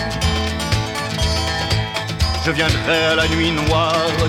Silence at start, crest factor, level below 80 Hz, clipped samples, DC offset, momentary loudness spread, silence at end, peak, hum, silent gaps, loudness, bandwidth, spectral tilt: 0 s; 14 dB; -28 dBFS; under 0.1%; under 0.1%; 5 LU; 0 s; -4 dBFS; none; none; -18 LUFS; 16.5 kHz; -4.5 dB/octave